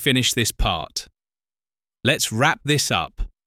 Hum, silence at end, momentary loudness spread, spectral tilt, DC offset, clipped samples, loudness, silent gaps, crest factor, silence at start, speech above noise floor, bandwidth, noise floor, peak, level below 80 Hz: none; 0.2 s; 11 LU; -3 dB/octave; under 0.1%; under 0.1%; -21 LUFS; none; 20 dB; 0 s; over 69 dB; 17 kHz; under -90 dBFS; -2 dBFS; -34 dBFS